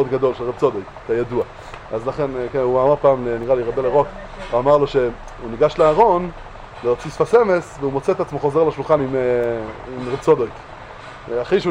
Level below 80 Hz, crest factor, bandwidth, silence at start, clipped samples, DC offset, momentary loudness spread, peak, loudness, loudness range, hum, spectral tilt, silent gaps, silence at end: -42 dBFS; 18 dB; 10 kHz; 0 s; under 0.1%; under 0.1%; 15 LU; 0 dBFS; -19 LUFS; 2 LU; none; -7 dB/octave; none; 0 s